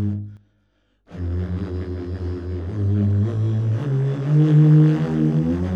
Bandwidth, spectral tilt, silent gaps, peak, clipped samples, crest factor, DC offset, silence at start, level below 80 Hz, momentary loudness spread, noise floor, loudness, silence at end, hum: 5.2 kHz; -10.5 dB/octave; none; -6 dBFS; under 0.1%; 14 dB; under 0.1%; 0 s; -40 dBFS; 15 LU; -65 dBFS; -20 LUFS; 0 s; none